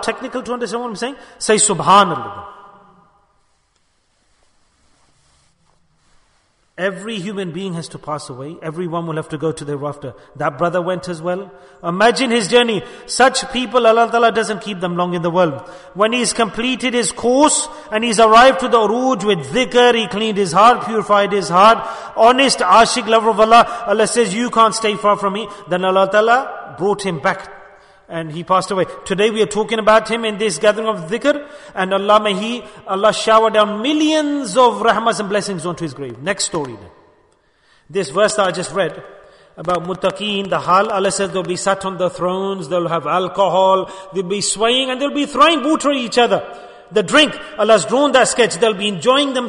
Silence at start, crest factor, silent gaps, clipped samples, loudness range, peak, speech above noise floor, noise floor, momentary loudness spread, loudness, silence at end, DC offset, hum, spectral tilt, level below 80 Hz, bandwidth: 0 s; 16 dB; none; under 0.1%; 10 LU; 0 dBFS; 46 dB; -61 dBFS; 14 LU; -15 LUFS; 0 s; under 0.1%; none; -3.5 dB/octave; -52 dBFS; 11 kHz